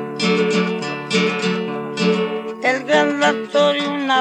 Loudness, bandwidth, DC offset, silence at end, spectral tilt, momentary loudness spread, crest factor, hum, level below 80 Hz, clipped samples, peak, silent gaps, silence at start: -18 LUFS; 10.5 kHz; under 0.1%; 0 s; -4.5 dB/octave; 6 LU; 16 dB; none; -74 dBFS; under 0.1%; -2 dBFS; none; 0 s